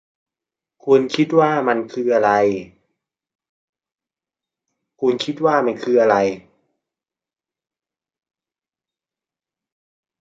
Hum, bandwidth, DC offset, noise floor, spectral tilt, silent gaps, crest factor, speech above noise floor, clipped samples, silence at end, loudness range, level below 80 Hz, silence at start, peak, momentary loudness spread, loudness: none; 7.8 kHz; under 0.1%; under -90 dBFS; -6 dB/octave; 3.35-3.39 s, 3.49-3.73 s; 20 dB; over 73 dB; under 0.1%; 3.8 s; 6 LU; -66 dBFS; 0.85 s; -2 dBFS; 7 LU; -18 LUFS